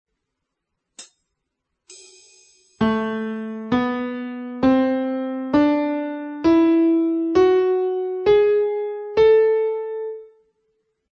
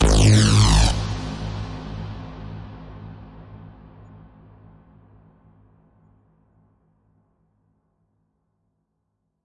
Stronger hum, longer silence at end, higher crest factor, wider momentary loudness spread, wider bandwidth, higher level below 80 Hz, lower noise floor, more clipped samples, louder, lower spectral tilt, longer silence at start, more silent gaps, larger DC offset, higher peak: neither; second, 0.9 s vs 5.9 s; about the same, 16 dB vs 20 dB; second, 13 LU vs 28 LU; second, 8.8 kHz vs 11.5 kHz; second, -54 dBFS vs -28 dBFS; first, -79 dBFS vs -75 dBFS; neither; about the same, -20 LUFS vs -19 LUFS; first, -6.5 dB/octave vs -5 dB/octave; first, 1 s vs 0 s; neither; neither; about the same, -6 dBFS vs -4 dBFS